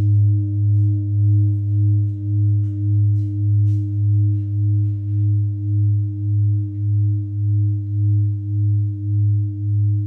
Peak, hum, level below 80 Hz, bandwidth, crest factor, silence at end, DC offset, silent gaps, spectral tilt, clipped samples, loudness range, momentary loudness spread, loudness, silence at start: -10 dBFS; none; -52 dBFS; 0.6 kHz; 8 dB; 0 s; under 0.1%; none; -13 dB/octave; under 0.1%; 2 LU; 4 LU; -19 LUFS; 0 s